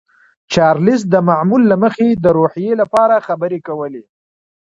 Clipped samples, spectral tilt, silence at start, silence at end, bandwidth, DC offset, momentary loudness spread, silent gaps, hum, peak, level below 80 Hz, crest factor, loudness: under 0.1%; -7 dB/octave; 0.5 s; 0.7 s; 10.5 kHz; under 0.1%; 11 LU; none; none; 0 dBFS; -50 dBFS; 14 dB; -13 LUFS